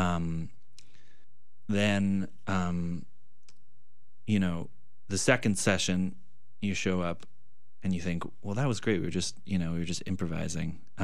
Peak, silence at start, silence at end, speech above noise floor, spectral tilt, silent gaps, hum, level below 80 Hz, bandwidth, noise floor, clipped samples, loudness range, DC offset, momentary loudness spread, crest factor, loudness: -10 dBFS; 0 s; 0 s; 44 dB; -5 dB/octave; none; none; -60 dBFS; 14 kHz; -74 dBFS; under 0.1%; 3 LU; 2%; 12 LU; 22 dB; -31 LUFS